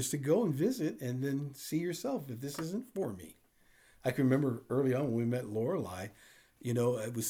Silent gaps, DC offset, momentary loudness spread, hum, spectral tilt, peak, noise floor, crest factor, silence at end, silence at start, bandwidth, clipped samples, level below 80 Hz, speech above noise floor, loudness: none; under 0.1%; 11 LU; none; -6 dB/octave; -16 dBFS; -65 dBFS; 18 dB; 0 s; 0 s; over 20 kHz; under 0.1%; -72 dBFS; 32 dB; -34 LUFS